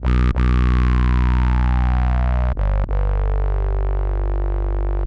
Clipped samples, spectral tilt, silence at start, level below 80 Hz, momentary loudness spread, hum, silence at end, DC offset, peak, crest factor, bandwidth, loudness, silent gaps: under 0.1%; -9 dB/octave; 0 s; -18 dBFS; 6 LU; none; 0 s; under 0.1%; -8 dBFS; 10 dB; 5 kHz; -20 LUFS; none